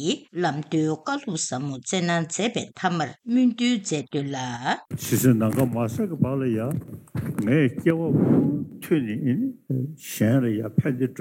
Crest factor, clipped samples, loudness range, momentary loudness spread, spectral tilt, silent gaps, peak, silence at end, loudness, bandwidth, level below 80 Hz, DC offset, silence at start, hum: 16 dB; under 0.1%; 2 LU; 9 LU; -5.5 dB/octave; none; -6 dBFS; 0 s; -24 LUFS; 17 kHz; -66 dBFS; under 0.1%; 0 s; none